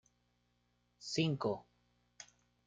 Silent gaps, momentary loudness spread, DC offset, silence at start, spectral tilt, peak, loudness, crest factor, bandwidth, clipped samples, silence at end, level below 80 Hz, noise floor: none; 21 LU; under 0.1%; 1 s; -5 dB/octave; -20 dBFS; -38 LUFS; 22 dB; 9.4 kHz; under 0.1%; 0.45 s; -76 dBFS; -78 dBFS